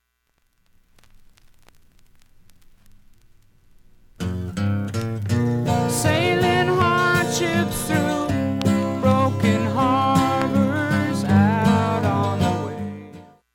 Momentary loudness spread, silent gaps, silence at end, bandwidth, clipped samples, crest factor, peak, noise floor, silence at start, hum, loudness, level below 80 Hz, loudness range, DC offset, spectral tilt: 9 LU; none; 0.3 s; 17.5 kHz; under 0.1%; 18 dB; -4 dBFS; -68 dBFS; 4.2 s; none; -20 LUFS; -48 dBFS; 11 LU; under 0.1%; -6 dB/octave